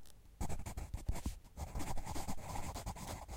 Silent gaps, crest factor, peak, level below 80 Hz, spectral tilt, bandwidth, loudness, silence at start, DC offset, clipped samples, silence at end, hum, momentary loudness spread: none; 16 dB; -26 dBFS; -46 dBFS; -4.5 dB/octave; 16.5 kHz; -46 LUFS; 0 s; under 0.1%; under 0.1%; 0 s; none; 4 LU